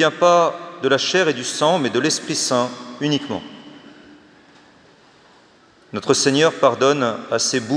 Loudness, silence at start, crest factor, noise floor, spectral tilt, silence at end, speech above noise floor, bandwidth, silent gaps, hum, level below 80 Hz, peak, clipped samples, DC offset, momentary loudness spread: -18 LUFS; 0 s; 20 dB; -52 dBFS; -3.5 dB/octave; 0 s; 34 dB; 10.5 kHz; none; none; -70 dBFS; 0 dBFS; under 0.1%; under 0.1%; 12 LU